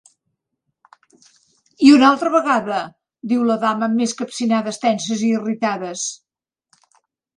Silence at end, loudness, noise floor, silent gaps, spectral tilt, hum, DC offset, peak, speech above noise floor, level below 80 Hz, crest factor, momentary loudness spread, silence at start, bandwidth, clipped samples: 1.2 s; -18 LUFS; -87 dBFS; none; -4 dB/octave; none; under 0.1%; 0 dBFS; 70 dB; -66 dBFS; 20 dB; 13 LU; 1.8 s; 10.5 kHz; under 0.1%